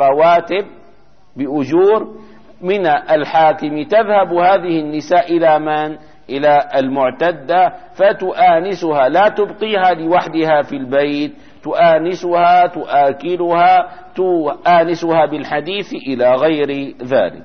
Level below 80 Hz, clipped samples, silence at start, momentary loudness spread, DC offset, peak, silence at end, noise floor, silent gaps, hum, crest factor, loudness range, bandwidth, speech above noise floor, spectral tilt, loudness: -56 dBFS; under 0.1%; 0 s; 9 LU; 0.8%; -2 dBFS; 0 s; -50 dBFS; none; none; 12 dB; 2 LU; 6.6 kHz; 36 dB; -6.5 dB/octave; -14 LUFS